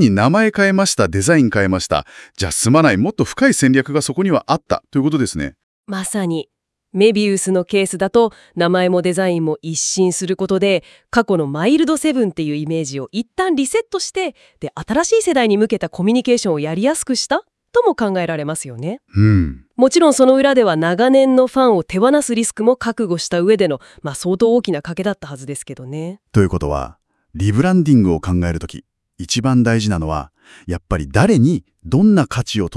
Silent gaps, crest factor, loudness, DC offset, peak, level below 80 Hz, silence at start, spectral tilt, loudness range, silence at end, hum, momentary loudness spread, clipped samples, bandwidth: 5.63-5.84 s; 16 dB; -16 LUFS; under 0.1%; 0 dBFS; -42 dBFS; 0 s; -5.5 dB/octave; 5 LU; 0 s; none; 12 LU; under 0.1%; 12 kHz